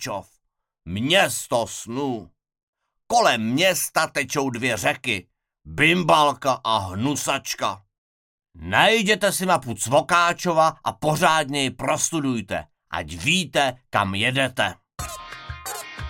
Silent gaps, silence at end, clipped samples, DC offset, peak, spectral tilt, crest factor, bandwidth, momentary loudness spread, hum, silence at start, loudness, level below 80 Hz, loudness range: 2.63-2.73 s, 7.98-8.38 s; 0 s; under 0.1%; under 0.1%; -2 dBFS; -3.5 dB/octave; 22 dB; 17 kHz; 14 LU; none; 0 s; -21 LUFS; -52 dBFS; 3 LU